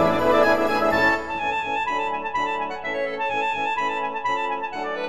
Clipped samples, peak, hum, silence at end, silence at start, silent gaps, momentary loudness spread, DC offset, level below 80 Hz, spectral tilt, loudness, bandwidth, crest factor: under 0.1%; -4 dBFS; none; 0 s; 0 s; none; 8 LU; under 0.1%; -52 dBFS; -4.5 dB/octave; -23 LUFS; 15 kHz; 20 dB